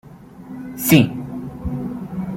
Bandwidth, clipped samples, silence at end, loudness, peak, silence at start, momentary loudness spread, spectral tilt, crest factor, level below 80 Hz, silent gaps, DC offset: 16.5 kHz; under 0.1%; 0 s; -20 LUFS; -2 dBFS; 0.05 s; 19 LU; -5.5 dB/octave; 20 dB; -42 dBFS; none; under 0.1%